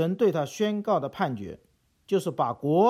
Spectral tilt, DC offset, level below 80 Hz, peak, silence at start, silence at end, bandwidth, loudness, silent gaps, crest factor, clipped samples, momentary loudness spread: -6.5 dB/octave; under 0.1%; -66 dBFS; -10 dBFS; 0 s; 0 s; 15.5 kHz; -27 LUFS; none; 16 dB; under 0.1%; 11 LU